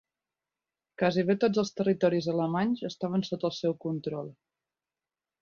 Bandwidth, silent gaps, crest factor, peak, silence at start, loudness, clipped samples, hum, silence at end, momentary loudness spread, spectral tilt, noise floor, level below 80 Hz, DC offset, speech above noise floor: 7.2 kHz; none; 18 dB; -12 dBFS; 1 s; -29 LUFS; under 0.1%; none; 1.1 s; 8 LU; -6.5 dB/octave; under -90 dBFS; -70 dBFS; under 0.1%; over 62 dB